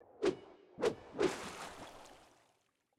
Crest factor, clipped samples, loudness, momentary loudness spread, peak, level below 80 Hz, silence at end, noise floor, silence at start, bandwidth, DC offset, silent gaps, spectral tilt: 20 dB; under 0.1%; -39 LUFS; 20 LU; -22 dBFS; -70 dBFS; 0.75 s; -78 dBFS; 0.1 s; 14.5 kHz; under 0.1%; none; -4.5 dB/octave